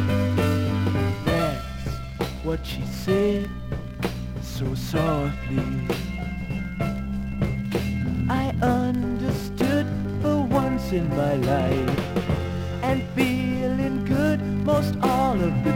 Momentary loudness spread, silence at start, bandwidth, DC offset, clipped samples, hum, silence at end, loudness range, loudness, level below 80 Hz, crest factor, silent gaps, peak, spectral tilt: 8 LU; 0 s; 17 kHz; under 0.1%; under 0.1%; none; 0 s; 4 LU; -25 LUFS; -38 dBFS; 18 dB; none; -6 dBFS; -7 dB/octave